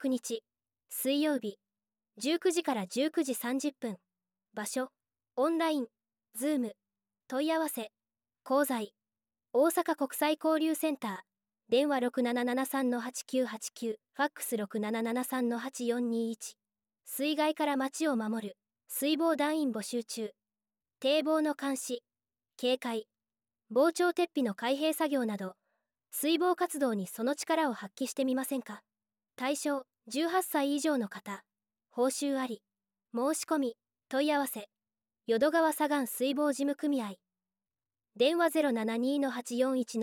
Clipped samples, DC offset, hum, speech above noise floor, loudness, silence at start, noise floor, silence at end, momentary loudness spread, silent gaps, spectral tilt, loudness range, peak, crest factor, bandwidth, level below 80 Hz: under 0.1%; under 0.1%; none; over 59 dB; -32 LUFS; 0 s; under -90 dBFS; 0 s; 12 LU; none; -3.5 dB/octave; 3 LU; -16 dBFS; 18 dB; 17 kHz; -88 dBFS